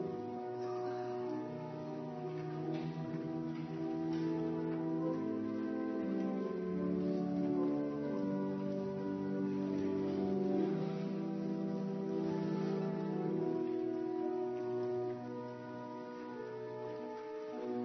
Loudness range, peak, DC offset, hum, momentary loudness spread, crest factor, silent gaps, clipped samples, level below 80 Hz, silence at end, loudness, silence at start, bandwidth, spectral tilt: 4 LU; -24 dBFS; under 0.1%; none; 8 LU; 14 dB; none; under 0.1%; -76 dBFS; 0 s; -39 LUFS; 0 s; 6.2 kHz; -8 dB/octave